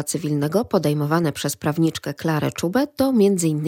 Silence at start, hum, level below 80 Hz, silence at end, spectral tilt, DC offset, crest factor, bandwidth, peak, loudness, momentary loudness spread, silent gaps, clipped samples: 0 s; none; -56 dBFS; 0 s; -5.5 dB/octave; under 0.1%; 16 dB; 17 kHz; -6 dBFS; -21 LUFS; 6 LU; none; under 0.1%